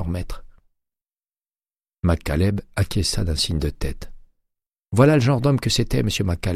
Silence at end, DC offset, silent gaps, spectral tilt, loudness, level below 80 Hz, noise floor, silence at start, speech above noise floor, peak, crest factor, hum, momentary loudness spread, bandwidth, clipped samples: 0 s; under 0.1%; none; -5.5 dB/octave; -21 LUFS; -32 dBFS; under -90 dBFS; 0 s; over 70 dB; -2 dBFS; 20 dB; none; 15 LU; 15.5 kHz; under 0.1%